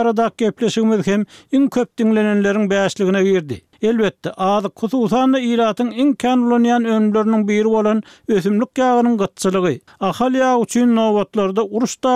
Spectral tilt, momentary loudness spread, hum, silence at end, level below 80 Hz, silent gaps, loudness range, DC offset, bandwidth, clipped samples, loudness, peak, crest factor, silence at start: -6 dB/octave; 5 LU; none; 0 s; -56 dBFS; none; 2 LU; under 0.1%; 13.5 kHz; under 0.1%; -17 LUFS; -6 dBFS; 10 dB; 0 s